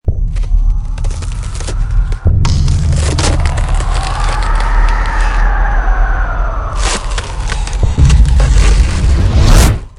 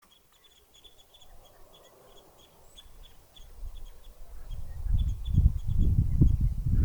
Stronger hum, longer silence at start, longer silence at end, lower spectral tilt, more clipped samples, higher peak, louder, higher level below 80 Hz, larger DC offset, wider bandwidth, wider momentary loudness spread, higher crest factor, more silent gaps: neither; second, 0.05 s vs 1.25 s; about the same, 0.1 s vs 0 s; second, -5 dB/octave vs -8.5 dB/octave; first, 0.8% vs under 0.1%; first, 0 dBFS vs -8 dBFS; first, -14 LUFS vs -28 LUFS; first, -12 dBFS vs -32 dBFS; neither; second, 13 kHz vs over 20 kHz; second, 10 LU vs 27 LU; second, 10 dB vs 20 dB; neither